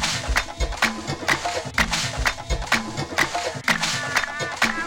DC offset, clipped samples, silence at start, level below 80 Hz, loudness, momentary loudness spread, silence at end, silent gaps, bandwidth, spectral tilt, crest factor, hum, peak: under 0.1%; under 0.1%; 0 s; -34 dBFS; -23 LUFS; 4 LU; 0 s; none; 19.5 kHz; -2.5 dB/octave; 18 dB; none; -6 dBFS